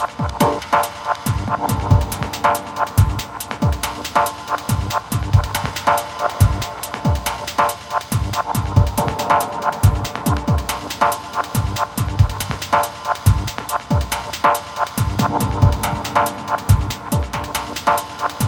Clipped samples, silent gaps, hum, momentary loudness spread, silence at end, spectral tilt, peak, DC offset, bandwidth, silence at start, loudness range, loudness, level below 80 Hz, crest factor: under 0.1%; none; none; 6 LU; 0 s; -5 dB/octave; -2 dBFS; under 0.1%; 19 kHz; 0 s; 1 LU; -19 LUFS; -28 dBFS; 18 dB